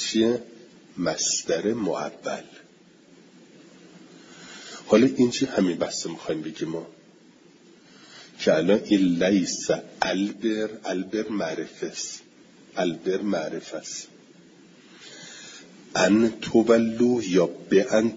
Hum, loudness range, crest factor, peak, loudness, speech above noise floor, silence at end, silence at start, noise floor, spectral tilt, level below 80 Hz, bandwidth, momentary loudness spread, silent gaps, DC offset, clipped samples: none; 8 LU; 22 dB; -4 dBFS; -24 LUFS; 30 dB; 0 s; 0 s; -54 dBFS; -4.5 dB/octave; -64 dBFS; 7.8 kHz; 21 LU; none; under 0.1%; under 0.1%